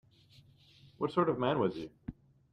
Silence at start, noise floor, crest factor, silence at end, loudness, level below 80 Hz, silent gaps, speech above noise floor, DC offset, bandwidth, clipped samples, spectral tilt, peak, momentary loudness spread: 1 s; -62 dBFS; 20 dB; 0.4 s; -33 LUFS; -62 dBFS; none; 30 dB; under 0.1%; 9.2 kHz; under 0.1%; -8.5 dB/octave; -16 dBFS; 18 LU